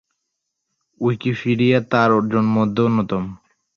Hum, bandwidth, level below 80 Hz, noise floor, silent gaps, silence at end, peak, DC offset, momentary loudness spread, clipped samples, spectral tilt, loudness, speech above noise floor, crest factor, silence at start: none; 6.8 kHz; -54 dBFS; -77 dBFS; none; 0.4 s; -4 dBFS; under 0.1%; 8 LU; under 0.1%; -8 dB/octave; -18 LUFS; 60 dB; 16 dB; 1 s